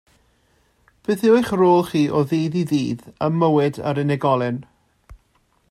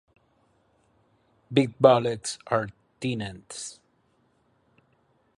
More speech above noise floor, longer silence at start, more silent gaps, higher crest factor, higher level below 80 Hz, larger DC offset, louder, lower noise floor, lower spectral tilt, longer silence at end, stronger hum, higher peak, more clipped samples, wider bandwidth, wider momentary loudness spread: about the same, 44 dB vs 43 dB; second, 1.1 s vs 1.5 s; neither; second, 16 dB vs 24 dB; first, -54 dBFS vs -64 dBFS; neither; first, -19 LUFS vs -26 LUFS; second, -63 dBFS vs -67 dBFS; first, -7.5 dB/octave vs -5.5 dB/octave; second, 0.55 s vs 1.65 s; neither; about the same, -4 dBFS vs -4 dBFS; neither; first, 15 kHz vs 11.5 kHz; second, 9 LU vs 18 LU